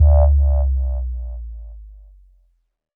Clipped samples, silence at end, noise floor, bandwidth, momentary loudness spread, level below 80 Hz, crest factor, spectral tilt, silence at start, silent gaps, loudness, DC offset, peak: under 0.1%; 1.05 s; -61 dBFS; 1.4 kHz; 22 LU; -18 dBFS; 14 dB; -14 dB/octave; 0 s; none; -19 LUFS; under 0.1%; -4 dBFS